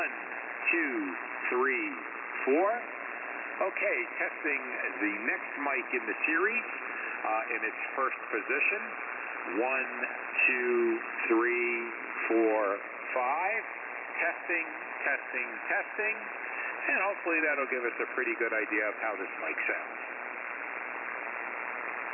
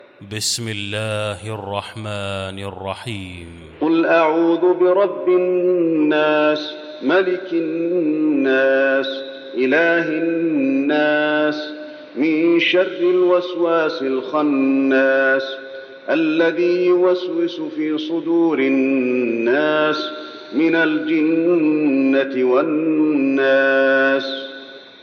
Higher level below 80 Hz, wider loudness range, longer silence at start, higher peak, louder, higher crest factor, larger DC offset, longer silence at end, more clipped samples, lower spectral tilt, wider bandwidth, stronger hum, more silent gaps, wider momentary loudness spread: second, under -90 dBFS vs -62 dBFS; about the same, 3 LU vs 3 LU; second, 0 s vs 0.2 s; second, -16 dBFS vs -2 dBFS; second, -31 LUFS vs -18 LUFS; about the same, 16 dB vs 14 dB; neither; about the same, 0 s vs 0.1 s; neither; first, -7.5 dB/octave vs -5 dB/octave; second, 3.1 kHz vs 13.5 kHz; neither; neither; second, 9 LU vs 13 LU